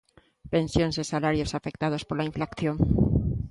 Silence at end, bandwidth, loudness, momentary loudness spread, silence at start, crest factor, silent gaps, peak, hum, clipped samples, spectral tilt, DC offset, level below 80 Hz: 0 s; 11.5 kHz; -27 LUFS; 6 LU; 0.45 s; 18 dB; none; -8 dBFS; none; under 0.1%; -6.5 dB/octave; under 0.1%; -38 dBFS